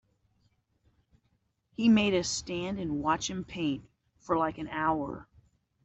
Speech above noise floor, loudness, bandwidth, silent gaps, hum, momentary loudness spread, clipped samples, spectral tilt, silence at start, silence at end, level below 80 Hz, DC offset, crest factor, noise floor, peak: 45 dB; -30 LUFS; 8.2 kHz; none; none; 13 LU; under 0.1%; -4.5 dB/octave; 1.8 s; 0.6 s; -58 dBFS; under 0.1%; 18 dB; -75 dBFS; -14 dBFS